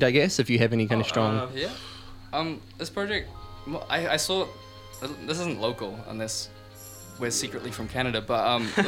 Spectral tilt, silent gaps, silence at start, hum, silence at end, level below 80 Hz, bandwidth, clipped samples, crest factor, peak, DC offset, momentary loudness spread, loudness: -4 dB/octave; none; 0 s; none; 0 s; -52 dBFS; 17 kHz; under 0.1%; 22 dB; -6 dBFS; under 0.1%; 19 LU; -28 LUFS